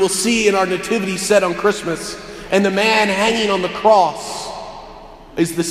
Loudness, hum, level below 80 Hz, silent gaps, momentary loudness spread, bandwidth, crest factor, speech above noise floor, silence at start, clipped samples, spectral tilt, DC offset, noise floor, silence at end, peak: -16 LUFS; none; -46 dBFS; none; 15 LU; 15.5 kHz; 18 dB; 21 dB; 0 s; under 0.1%; -3.5 dB/octave; under 0.1%; -38 dBFS; 0 s; 0 dBFS